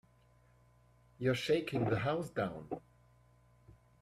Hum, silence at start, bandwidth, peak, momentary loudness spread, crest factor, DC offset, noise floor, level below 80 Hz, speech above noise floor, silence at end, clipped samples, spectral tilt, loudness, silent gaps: 60 Hz at -60 dBFS; 1.2 s; 15 kHz; -20 dBFS; 13 LU; 18 dB; under 0.1%; -67 dBFS; -66 dBFS; 32 dB; 1.25 s; under 0.1%; -6.5 dB/octave; -36 LUFS; none